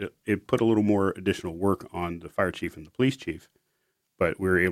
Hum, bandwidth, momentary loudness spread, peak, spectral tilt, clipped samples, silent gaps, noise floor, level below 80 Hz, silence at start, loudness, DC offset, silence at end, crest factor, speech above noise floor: none; 15 kHz; 13 LU; -8 dBFS; -6.5 dB/octave; under 0.1%; none; -76 dBFS; -54 dBFS; 0 s; -27 LUFS; under 0.1%; 0 s; 18 dB; 50 dB